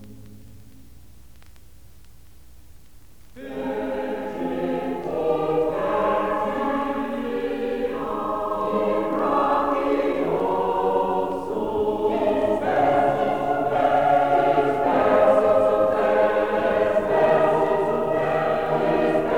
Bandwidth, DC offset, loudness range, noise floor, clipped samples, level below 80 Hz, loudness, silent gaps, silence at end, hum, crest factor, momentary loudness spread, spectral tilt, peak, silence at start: 18 kHz; 0.6%; 10 LU; -50 dBFS; under 0.1%; -50 dBFS; -22 LUFS; none; 0 s; none; 18 dB; 8 LU; -7 dB/octave; -4 dBFS; 0 s